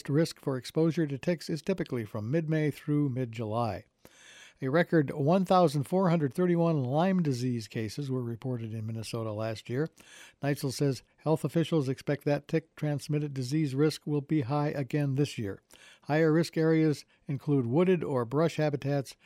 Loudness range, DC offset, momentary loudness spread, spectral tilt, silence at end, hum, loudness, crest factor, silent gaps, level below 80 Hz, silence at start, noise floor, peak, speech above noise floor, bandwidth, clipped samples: 5 LU; under 0.1%; 10 LU; -7 dB/octave; 0.15 s; none; -30 LUFS; 18 dB; none; -68 dBFS; 0.05 s; -55 dBFS; -12 dBFS; 26 dB; 15 kHz; under 0.1%